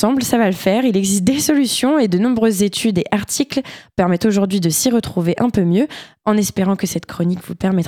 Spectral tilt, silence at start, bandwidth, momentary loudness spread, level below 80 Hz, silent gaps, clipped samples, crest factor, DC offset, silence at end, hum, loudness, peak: -5 dB/octave; 0 s; 19 kHz; 6 LU; -48 dBFS; none; under 0.1%; 14 dB; under 0.1%; 0 s; none; -17 LUFS; -2 dBFS